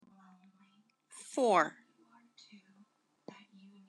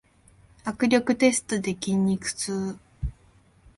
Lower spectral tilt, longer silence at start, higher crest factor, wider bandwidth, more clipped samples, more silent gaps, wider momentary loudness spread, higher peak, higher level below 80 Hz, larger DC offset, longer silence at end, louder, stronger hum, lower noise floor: about the same, -4 dB/octave vs -4.5 dB/octave; first, 1.15 s vs 0.65 s; about the same, 24 dB vs 20 dB; about the same, 12.5 kHz vs 11.5 kHz; neither; neither; first, 28 LU vs 15 LU; second, -14 dBFS vs -6 dBFS; second, under -90 dBFS vs -44 dBFS; neither; first, 2.2 s vs 0.65 s; second, -31 LUFS vs -25 LUFS; neither; first, -69 dBFS vs -58 dBFS